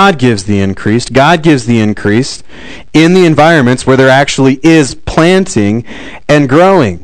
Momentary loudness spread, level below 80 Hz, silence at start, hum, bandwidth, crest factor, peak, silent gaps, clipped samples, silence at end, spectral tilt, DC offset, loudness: 7 LU; -34 dBFS; 0 s; none; 12 kHz; 8 dB; 0 dBFS; none; 7%; 0.05 s; -5.5 dB/octave; 3%; -8 LUFS